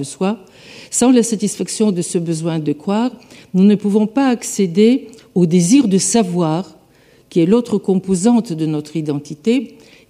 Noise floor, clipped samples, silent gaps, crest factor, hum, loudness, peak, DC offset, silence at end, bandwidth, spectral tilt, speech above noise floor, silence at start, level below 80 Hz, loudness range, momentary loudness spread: -50 dBFS; under 0.1%; none; 14 dB; none; -16 LUFS; -2 dBFS; under 0.1%; 0.4 s; 15 kHz; -5.5 dB/octave; 34 dB; 0 s; -58 dBFS; 3 LU; 9 LU